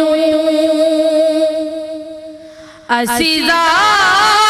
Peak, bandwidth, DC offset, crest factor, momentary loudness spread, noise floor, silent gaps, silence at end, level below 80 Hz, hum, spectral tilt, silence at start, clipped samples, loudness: 0 dBFS; 14.5 kHz; under 0.1%; 12 dB; 17 LU; -36 dBFS; none; 0 s; -48 dBFS; none; -2 dB/octave; 0 s; under 0.1%; -12 LUFS